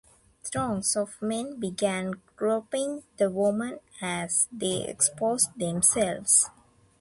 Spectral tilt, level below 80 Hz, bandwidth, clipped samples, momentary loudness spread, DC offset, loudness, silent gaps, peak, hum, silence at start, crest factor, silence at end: -3 dB/octave; -62 dBFS; 12 kHz; under 0.1%; 12 LU; under 0.1%; -26 LUFS; none; -8 dBFS; none; 0.45 s; 20 dB; 0.5 s